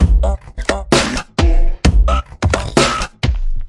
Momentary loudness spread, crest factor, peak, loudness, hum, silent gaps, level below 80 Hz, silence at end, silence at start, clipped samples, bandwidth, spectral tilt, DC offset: 6 LU; 14 dB; 0 dBFS; -16 LUFS; none; none; -16 dBFS; 0 s; 0 s; under 0.1%; 11.5 kHz; -5 dB/octave; under 0.1%